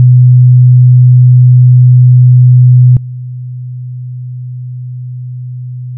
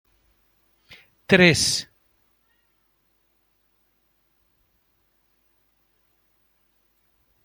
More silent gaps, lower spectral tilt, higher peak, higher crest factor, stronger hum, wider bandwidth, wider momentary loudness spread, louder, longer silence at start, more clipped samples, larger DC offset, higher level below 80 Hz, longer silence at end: neither; first, -22 dB/octave vs -3.5 dB/octave; about the same, 0 dBFS vs -2 dBFS; second, 6 dB vs 26 dB; neither; second, 0.3 kHz vs 17 kHz; second, 18 LU vs 29 LU; first, -5 LUFS vs -18 LUFS; second, 0 s vs 1.3 s; first, 0.3% vs under 0.1%; neither; first, -42 dBFS vs -58 dBFS; second, 0 s vs 5.6 s